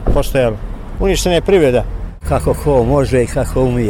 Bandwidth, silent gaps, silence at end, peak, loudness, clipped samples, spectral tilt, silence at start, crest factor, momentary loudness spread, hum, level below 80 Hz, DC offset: 17 kHz; none; 0 s; -2 dBFS; -14 LUFS; under 0.1%; -6 dB/octave; 0 s; 12 dB; 12 LU; none; -22 dBFS; under 0.1%